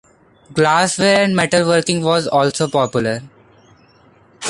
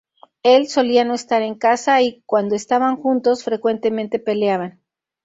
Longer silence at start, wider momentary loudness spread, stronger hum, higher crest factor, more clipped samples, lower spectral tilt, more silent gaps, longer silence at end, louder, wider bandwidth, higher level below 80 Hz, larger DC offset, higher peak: about the same, 0.5 s vs 0.45 s; about the same, 7 LU vs 6 LU; neither; about the same, 16 dB vs 16 dB; neither; about the same, -4 dB/octave vs -4.5 dB/octave; neither; second, 0 s vs 0.55 s; first, -15 LUFS vs -18 LUFS; first, 11.5 kHz vs 8 kHz; first, -52 dBFS vs -66 dBFS; neither; about the same, -2 dBFS vs -2 dBFS